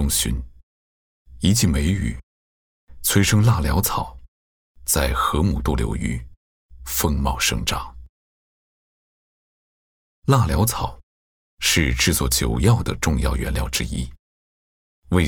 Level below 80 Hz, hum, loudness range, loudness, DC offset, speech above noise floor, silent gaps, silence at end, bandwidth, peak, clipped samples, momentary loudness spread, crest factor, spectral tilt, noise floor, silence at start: -30 dBFS; none; 5 LU; -21 LUFS; under 0.1%; over 70 dB; 0.63-1.25 s, 2.23-2.87 s, 4.28-4.75 s, 6.37-6.69 s, 8.09-10.22 s, 11.03-11.58 s, 14.19-15.02 s; 0 s; 19.5 kHz; -4 dBFS; under 0.1%; 12 LU; 20 dB; -4 dB/octave; under -90 dBFS; 0 s